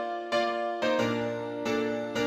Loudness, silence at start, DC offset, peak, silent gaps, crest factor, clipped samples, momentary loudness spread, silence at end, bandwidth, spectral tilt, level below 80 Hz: -29 LUFS; 0 s; under 0.1%; -16 dBFS; none; 14 dB; under 0.1%; 4 LU; 0 s; 16 kHz; -5 dB/octave; -66 dBFS